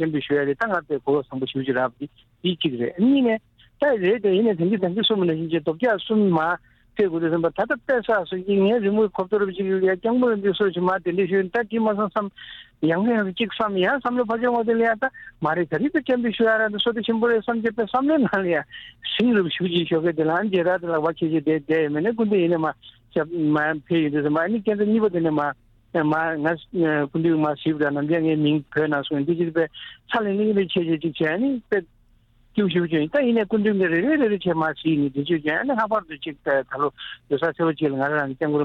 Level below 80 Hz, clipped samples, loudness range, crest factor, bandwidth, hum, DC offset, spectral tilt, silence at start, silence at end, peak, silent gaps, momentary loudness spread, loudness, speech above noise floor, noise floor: -58 dBFS; under 0.1%; 2 LU; 14 dB; 5.4 kHz; none; under 0.1%; -8.5 dB/octave; 0 s; 0 s; -8 dBFS; none; 6 LU; -22 LUFS; 36 dB; -57 dBFS